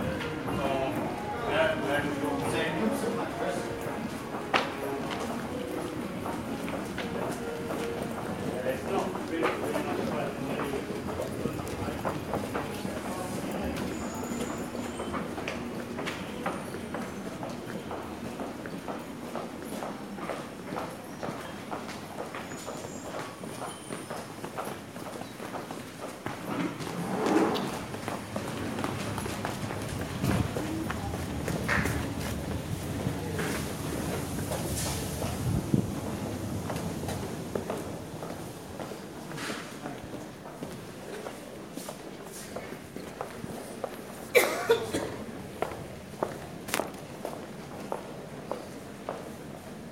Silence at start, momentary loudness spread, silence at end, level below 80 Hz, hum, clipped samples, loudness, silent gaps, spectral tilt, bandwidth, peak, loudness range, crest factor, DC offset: 0 s; 11 LU; 0 s; -52 dBFS; none; under 0.1%; -34 LUFS; none; -5 dB/octave; 16 kHz; -2 dBFS; 8 LU; 32 dB; under 0.1%